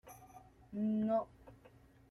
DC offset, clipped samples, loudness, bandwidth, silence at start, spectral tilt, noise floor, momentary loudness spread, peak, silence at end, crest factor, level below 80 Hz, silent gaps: under 0.1%; under 0.1%; -37 LUFS; 13 kHz; 0.05 s; -8.5 dB/octave; -63 dBFS; 24 LU; -24 dBFS; 0.55 s; 16 dB; -70 dBFS; none